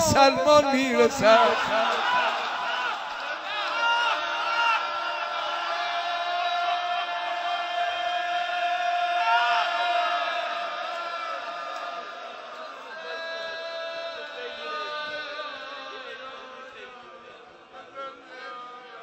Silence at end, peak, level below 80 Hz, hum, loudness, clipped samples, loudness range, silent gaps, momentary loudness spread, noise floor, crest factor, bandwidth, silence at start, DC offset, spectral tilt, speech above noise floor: 0 s; -6 dBFS; -60 dBFS; none; -25 LUFS; under 0.1%; 12 LU; none; 19 LU; -48 dBFS; 22 dB; 16 kHz; 0 s; under 0.1%; -3 dB/octave; 28 dB